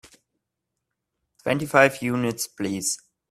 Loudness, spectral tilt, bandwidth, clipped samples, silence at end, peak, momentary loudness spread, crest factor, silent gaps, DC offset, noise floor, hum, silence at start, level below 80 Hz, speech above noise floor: -23 LUFS; -4 dB/octave; 15.5 kHz; under 0.1%; 0.35 s; 0 dBFS; 11 LU; 26 dB; none; under 0.1%; -82 dBFS; none; 1.45 s; -64 dBFS; 59 dB